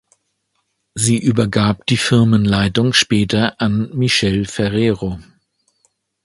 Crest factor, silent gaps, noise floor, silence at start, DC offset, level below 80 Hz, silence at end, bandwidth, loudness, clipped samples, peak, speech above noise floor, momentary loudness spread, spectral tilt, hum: 16 dB; none; -69 dBFS; 0.95 s; under 0.1%; -42 dBFS; 1 s; 11.5 kHz; -16 LUFS; under 0.1%; 0 dBFS; 54 dB; 6 LU; -5 dB/octave; none